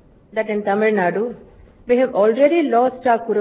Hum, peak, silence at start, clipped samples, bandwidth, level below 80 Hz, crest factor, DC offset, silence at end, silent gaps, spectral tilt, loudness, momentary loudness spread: none; -2 dBFS; 0.35 s; under 0.1%; 4 kHz; -56 dBFS; 16 dB; under 0.1%; 0 s; none; -10 dB/octave; -18 LUFS; 10 LU